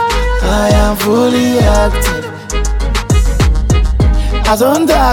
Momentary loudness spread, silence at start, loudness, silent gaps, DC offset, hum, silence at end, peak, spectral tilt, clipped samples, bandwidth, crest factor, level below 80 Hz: 6 LU; 0 s; -12 LUFS; none; under 0.1%; none; 0 s; 0 dBFS; -5.5 dB/octave; under 0.1%; 17.5 kHz; 10 dB; -14 dBFS